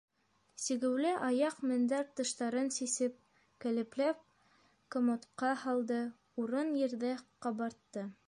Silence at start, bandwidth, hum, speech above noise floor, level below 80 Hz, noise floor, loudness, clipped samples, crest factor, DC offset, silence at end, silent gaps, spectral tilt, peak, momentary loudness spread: 0.6 s; 11.5 kHz; none; 35 dB; -84 dBFS; -70 dBFS; -36 LUFS; under 0.1%; 14 dB; under 0.1%; 0.15 s; none; -3.5 dB/octave; -22 dBFS; 8 LU